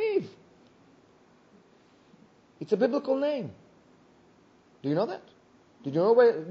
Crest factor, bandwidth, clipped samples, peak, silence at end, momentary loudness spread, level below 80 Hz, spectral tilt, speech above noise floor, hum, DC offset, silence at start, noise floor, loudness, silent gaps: 20 dB; 6.8 kHz; under 0.1%; -10 dBFS; 0 s; 21 LU; -78 dBFS; -5.5 dB/octave; 35 dB; none; under 0.1%; 0 s; -60 dBFS; -27 LUFS; none